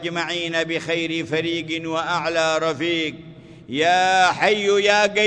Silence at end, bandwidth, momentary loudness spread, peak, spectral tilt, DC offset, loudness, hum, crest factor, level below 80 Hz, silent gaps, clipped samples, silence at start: 0 s; 10 kHz; 8 LU; -4 dBFS; -3.5 dB/octave; under 0.1%; -20 LUFS; none; 18 dB; -60 dBFS; none; under 0.1%; 0 s